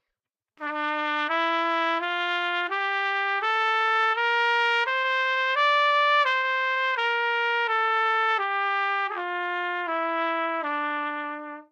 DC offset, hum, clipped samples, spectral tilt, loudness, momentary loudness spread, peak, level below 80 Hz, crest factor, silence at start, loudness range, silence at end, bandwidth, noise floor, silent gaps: under 0.1%; none; under 0.1%; 0.5 dB/octave; -24 LUFS; 7 LU; -12 dBFS; under -90 dBFS; 14 dB; 0.6 s; 4 LU; 0.1 s; 9.4 kHz; -87 dBFS; none